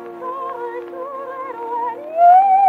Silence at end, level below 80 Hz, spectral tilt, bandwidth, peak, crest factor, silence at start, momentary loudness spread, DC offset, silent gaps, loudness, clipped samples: 0 s; -74 dBFS; -5.5 dB/octave; 4 kHz; -2 dBFS; 14 dB; 0 s; 18 LU; under 0.1%; none; -17 LUFS; under 0.1%